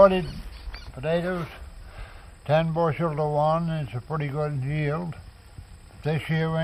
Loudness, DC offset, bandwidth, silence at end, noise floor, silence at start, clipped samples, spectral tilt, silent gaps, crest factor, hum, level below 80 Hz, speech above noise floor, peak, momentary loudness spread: -26 LUFS; under 0.1%; 11.5 kHz; 0 s; -45 dBFS; 0 s; under 0.1%; -8 dB/octave; none; 22 dB; none; -44 dBFS; 19 dB; -4 dBFS; 20 LU